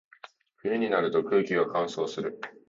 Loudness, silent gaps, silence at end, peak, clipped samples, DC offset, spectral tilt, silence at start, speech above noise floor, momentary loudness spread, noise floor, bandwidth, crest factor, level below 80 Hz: -28 LUFS; none; 0.2 s; -10 dBFS; under 0.1%; under 0.1%; -5.5 dB/octave; 0.65 s; 25 dB; 10 LU; -53 dBFS; 7.6 kHz; 18 dB; -72 dBFS